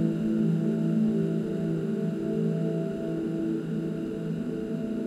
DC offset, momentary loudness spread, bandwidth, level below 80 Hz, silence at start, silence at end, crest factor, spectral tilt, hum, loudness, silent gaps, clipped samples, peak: under 0.1%; 6 LU; 10 kHz; -58 dBFS; 0 s; 0 s; 14 dB; -9.5 dB/octave; none; -29 LUFS; none; under 0.1%; -12 dBFS